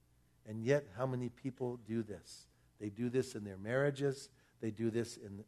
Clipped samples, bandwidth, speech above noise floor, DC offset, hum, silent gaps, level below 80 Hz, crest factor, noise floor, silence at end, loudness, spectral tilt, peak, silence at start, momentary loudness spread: under 0.1%; 13 kHz; 22 dB; under 0.1%; none; none; -74 dBFS; 20 dB; -61 dBFS; 0.05 s; -39 LUFS; -6.5 dB/octave; -20 dBFS; 0.45 s; 13 LU